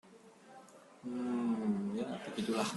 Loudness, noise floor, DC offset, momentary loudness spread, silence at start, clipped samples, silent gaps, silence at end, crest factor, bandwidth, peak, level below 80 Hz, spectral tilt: -37 LUFS; -59 dBFS; under 0.1%; 22 LU; 0.05 s; under 0.1%; none; 0 s; 18 dB; 12.5 kHz; -20 dBFS; -78 dBFS; -5.5 dB/octave